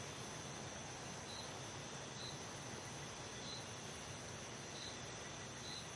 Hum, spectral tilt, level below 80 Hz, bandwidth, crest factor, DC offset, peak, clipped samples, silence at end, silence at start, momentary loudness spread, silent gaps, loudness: none; -3 dB/octave; -70 dBFS; 11.5 kHz; 14 dB; under 0.1%; -36 dBFS; under 0.1%; 0 s; 0 s; 1 LU; none; -48 LUFS